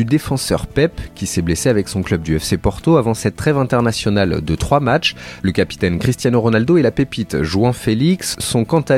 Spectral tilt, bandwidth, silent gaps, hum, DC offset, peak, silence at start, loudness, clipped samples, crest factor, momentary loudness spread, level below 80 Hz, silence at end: -5.5 dB/octave; 16 kHz; none; none; under 0.1%; 0 dBFS; 0 s; -17 LUFS; under 0.1%; 16 dB; 6 LU; -34 dBFS; 0 s